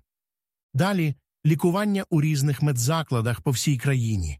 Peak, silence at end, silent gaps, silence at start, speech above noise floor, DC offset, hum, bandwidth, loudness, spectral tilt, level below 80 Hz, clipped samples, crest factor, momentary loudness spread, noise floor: -10 dBFS; 0 s; none; 0.75 s; over 67 dB; under 0.1%; none; 15.5 kHz; -24 LUFS; -6 dB/octave; -46 dBFS; under 0.1%; 14 dB; 4 LU; under -90 dBFS